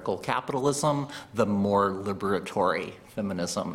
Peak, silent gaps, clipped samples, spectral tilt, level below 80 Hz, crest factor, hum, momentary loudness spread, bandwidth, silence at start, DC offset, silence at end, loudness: -8 dBFS; none; under 0.1%; -5 dB/octave; -62 dBFS; 20 dB; none; 8 LU; 16 kHz; 0 s; under 0.1%; 0 s; -28 LUFS